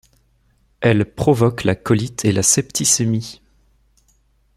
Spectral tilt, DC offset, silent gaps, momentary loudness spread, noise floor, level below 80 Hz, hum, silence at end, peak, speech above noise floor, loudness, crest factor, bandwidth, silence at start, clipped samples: -4.5 dB/octave; under 0.1%; none; 6 LU; -59 dBFS; -48 dBFS; none; 1.25 s; 0 dBFS; 42 dB; -17 LUFS; 18 dB; 15.5 kHz; 0.8 s; under 0.1%